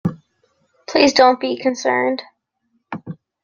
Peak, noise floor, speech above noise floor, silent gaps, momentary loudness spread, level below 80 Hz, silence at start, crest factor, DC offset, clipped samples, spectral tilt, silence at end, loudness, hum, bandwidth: 0 dBFS; -68 dBFS; 52 dB; none; 21 LU; -58 dBFS; 0.05 s; 20 dB; under 0.1%; under 0.1%; -4.5 dB/octave; 0.3 s; -17 LUFS; none; 7.4 kHz